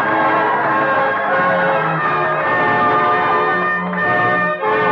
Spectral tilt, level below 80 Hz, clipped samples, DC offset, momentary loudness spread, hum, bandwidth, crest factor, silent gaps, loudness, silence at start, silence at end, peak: -7.5 dB/octave; -58 dBFS; under 0.1%; under 0.1%; 3 LU; none; 7 kHz; 10 dB; none; -15 LUFS; 0 s; 0 s; -6 dBFS